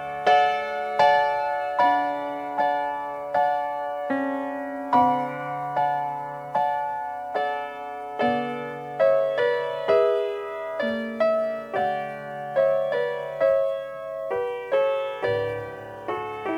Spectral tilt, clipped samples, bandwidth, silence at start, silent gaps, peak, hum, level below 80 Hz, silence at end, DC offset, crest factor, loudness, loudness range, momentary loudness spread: -5.5 dB/octave; under 0.1%; 12 kHz; 0 s; none; -8 dBFS; none; -64 dBFS; 0 s; under 0.1%; 18 dB; -25 LUFS; 3 LU; 11 LU